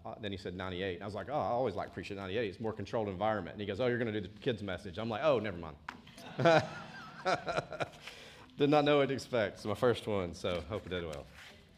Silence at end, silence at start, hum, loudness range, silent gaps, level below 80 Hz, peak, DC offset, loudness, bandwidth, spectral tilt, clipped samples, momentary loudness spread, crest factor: 0.2 s; 0 s; none; 4 LU; none; -64 dBFS; -12 dBFS; under 0.1%; -34 LUFS; 14.5 kHz; -6 dB/octave; under 0.1%; 17 LU; 24 dB